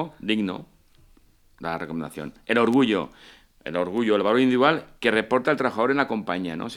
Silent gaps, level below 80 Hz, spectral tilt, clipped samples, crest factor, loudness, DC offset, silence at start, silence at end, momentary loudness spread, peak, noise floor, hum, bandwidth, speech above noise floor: none; -60 dBFS; -6 dB/octave; under 0.1%; 20 dB; -23 LUFS; under 0.1%; 0 s; 0 s; 14 LU; -4 dBFS; -57 dBFS; none; 13 kHz; 33 dB